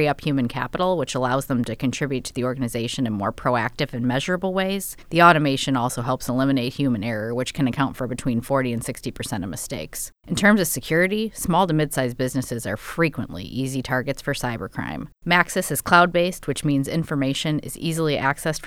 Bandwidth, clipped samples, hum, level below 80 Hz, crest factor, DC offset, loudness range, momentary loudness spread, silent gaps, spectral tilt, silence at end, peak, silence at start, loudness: 17.5 kHz; under 0.1%; none; -46 dBFS; 22 dB; under 0.1%; 4 LU; 11 LU; none; -5 dB/octave; 0 s; 0 dBFS; 0 s; -23 LUFS